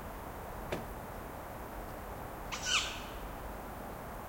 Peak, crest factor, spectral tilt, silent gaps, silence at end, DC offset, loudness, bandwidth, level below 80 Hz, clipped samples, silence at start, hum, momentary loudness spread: -18 dBFS; 24 dB; -2.5 dB/octave; none; 0 s; under 0.1%; -40 LUFS; 16.5 kHz; -50 dBFS; under 0.1%; 0 s; none; 13 LU